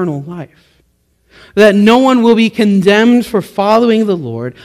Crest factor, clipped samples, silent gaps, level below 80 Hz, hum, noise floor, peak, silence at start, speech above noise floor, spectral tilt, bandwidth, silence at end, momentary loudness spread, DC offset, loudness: 12 dB; 0.9%; none; -50 dBFS; none; -57 dBFS; 0 dBFS; 0 s; 46 dB; -6 dB/octave; 14.5 kHz; 0.15 s; 14 LU; under 0.1%; -10 LUFS